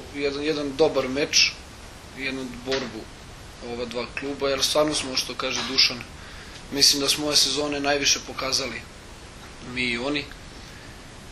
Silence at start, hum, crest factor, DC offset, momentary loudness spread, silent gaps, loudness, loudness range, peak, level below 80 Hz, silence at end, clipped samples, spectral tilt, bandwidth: 0 s; none; 24 dB; under 0.1%; 23 LU; none; -23 LUFS; 6 LU; -2 dBFS; -48 dBFS; 0 s; under 0.1%; -1.5 dB/octave; 13.5 kHz